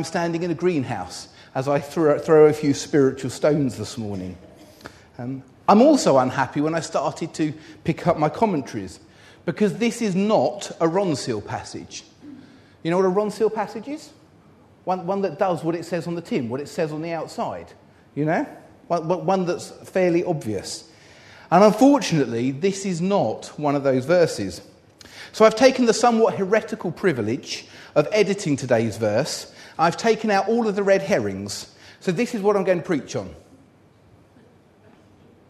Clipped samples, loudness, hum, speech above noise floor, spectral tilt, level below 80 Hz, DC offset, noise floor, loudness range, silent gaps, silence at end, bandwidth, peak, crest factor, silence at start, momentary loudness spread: under 0.1%; -22 LUFS; none; 33 dB; -5.5 dB/octave; -60 dBFS; under 0.1%; -54 dBFS; 6 LU; none; 2.1 s; 13.5 kHz; -2 dBFS; 20 dB; 0 s; 16 LU